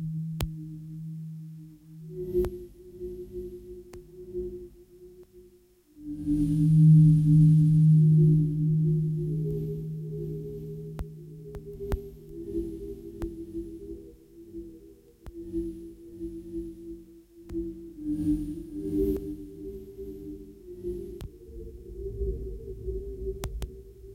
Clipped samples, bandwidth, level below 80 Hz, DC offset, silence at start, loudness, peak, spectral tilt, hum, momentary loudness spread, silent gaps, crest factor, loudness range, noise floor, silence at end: under 0.1%; 10 kHz; -44 dBFS; under 0.1%; 0 s; -27 LUFS; -6 dBFS; -10 dB/octave; none; 25 LU; none; 22 dB; 19 LU; -59 dBFS; 0 s